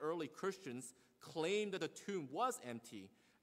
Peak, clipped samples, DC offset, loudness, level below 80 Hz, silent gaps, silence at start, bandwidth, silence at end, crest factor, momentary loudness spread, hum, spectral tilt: -26 dBFS; under 0.1%; under 0.1%; -44 LUFS; -88 dBFS; none; 0 s; 16 kHz; 0.35 s; 18 dB; 16 LU; none; -4 dB/octave